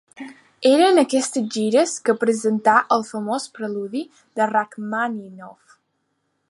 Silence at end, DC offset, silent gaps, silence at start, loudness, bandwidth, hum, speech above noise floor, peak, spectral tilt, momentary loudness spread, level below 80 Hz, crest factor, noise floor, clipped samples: 0.95 s; under 0.1%; none; 0.2 s; -20 LUFS; 11.5 kHz; none; 52 dB; -2 dBFS; -4 dB/octave; 16 LU; -76 dBFS; 20 dB; -72 dBFS; under 0.1%